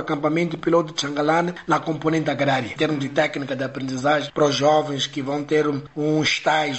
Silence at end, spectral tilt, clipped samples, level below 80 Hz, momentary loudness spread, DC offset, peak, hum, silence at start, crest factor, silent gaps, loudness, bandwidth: 0 s; -5 dB/octave; under 0.1%; -60 dBFS; 6 LU; 0.1%; -6 dBFS; none; 0 s; 16 dB; none; -22 LUFS; 8.2 kHz